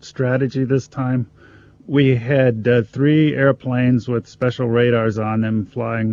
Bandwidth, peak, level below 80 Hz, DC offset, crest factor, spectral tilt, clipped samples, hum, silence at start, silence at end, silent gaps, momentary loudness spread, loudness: 7.4 kHz; -2 dBFS; -54 dBFS; under 0.1%; 16 dB; -8 dB/octave; under 0.1%; none; 0.05 s; 0 s; none; 7 LU; -18 LUFS